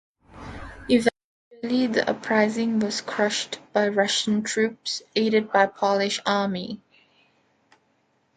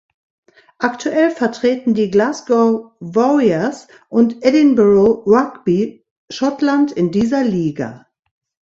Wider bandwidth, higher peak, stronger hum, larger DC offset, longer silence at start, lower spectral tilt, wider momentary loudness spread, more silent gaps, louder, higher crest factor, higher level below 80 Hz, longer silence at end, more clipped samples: first, 11.5 kHz vs 7.8 kHz; second, -4 dBFS vs 0 dBFS; neither; neither; second, 0.35 s vs 0.8 s; second, -4 dB/octave vs -6.5 dB/octave; first, 15 LU vs 10 LU; first, 1.24-1.51 s vs 6.11-6.28 s; second, -23 LUFS vs -15 LUFS; about the same, 20 dB vs 16 dB; about the same, -56 dBFS vs -54 dBFS; first, 1.6 s vs 0.7 s; neither